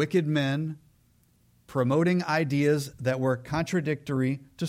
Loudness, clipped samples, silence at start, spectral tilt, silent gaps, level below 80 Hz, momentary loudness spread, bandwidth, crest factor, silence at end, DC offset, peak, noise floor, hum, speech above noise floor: -27 LUFS; under 0.1%; 0 s; -6.5 dB/octave; none; -60 dBFS; 7 LU; 15.5 kHz; 16 dB; 0 s; under 0.1%; -12 dBFS; -64 dBFS; none; 37 dB